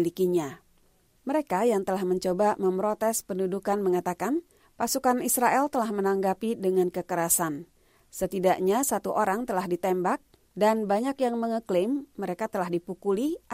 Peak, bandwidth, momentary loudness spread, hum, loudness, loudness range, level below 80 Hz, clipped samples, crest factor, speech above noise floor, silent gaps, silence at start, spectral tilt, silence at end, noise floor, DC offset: -10 dBFS; 16 kHz; 8 LU; none; -27 LUFS; 2 LU; -62 dBFS; under 0.1%; 18 dB; 37 dB; none; 0 s; -4.5 dB/octave; 0 s; -64 dBFS; under 0.1%